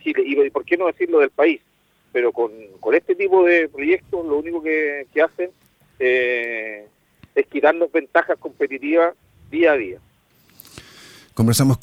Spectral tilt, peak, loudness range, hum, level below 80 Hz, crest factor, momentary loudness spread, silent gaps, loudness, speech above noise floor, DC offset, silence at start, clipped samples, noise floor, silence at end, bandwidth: -5.5 dB/octave; -2 dBFS; 3 LU; none; -56 dBFS; 18 dB; 11 LU; none; -19 LUFS; 38 dB; under 0.1%; 0.05 s; under 0.1%; -57 dBFS; 0.05 s; 17 kHz